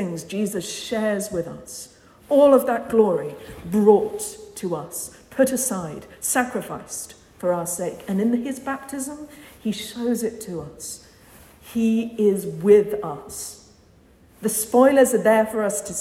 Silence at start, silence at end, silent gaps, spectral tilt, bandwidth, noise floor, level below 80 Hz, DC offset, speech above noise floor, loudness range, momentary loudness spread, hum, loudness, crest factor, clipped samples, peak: 0 s; 0 s; none; -4.5 dB/octave; 16.5 kHz; -53 dBFS; -58 dBFS; under 0.1%; 32 dB; 7 LU; 17 LU; none; -22 LUFS; 20 dB; under 0.1%; -2 dBFS